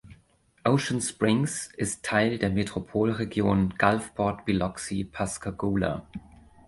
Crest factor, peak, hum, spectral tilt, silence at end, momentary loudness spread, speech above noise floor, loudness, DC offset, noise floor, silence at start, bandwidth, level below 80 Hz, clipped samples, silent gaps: 22 dB; -4 dBFS; none; -5.5 dB/octave; 0.4 s; 7 LU; 36 dB; -27 LUFS; under 0.1%; -63 dBFS; 0.05 s; 11.5 kHz; -48 dBFS; under 0.1%; none